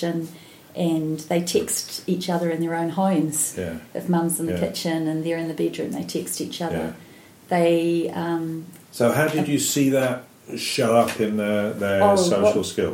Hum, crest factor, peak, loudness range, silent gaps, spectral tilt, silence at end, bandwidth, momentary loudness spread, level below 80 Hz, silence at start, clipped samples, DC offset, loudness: none; 18 dB; -4 dBFS; 4 LU; none; -4.5 dB/octave; 0 s; 16.5 kHz; 11 LU; -60 dBFS; 0 s; under 0.1%; under 0.1%; -23 LUFS